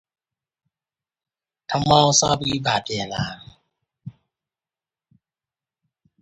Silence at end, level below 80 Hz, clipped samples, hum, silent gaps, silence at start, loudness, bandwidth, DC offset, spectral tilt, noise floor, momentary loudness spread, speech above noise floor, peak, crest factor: 2.1 s; -52 dBFS; under 0.1%; none; none; 1.7 s; -20 LUFS; 10.5 kHz; under 0.1%; -3.5 dB/octave; under -90 dBFS; 16 LU; over 70 dB; 0 dBFS; 24 dB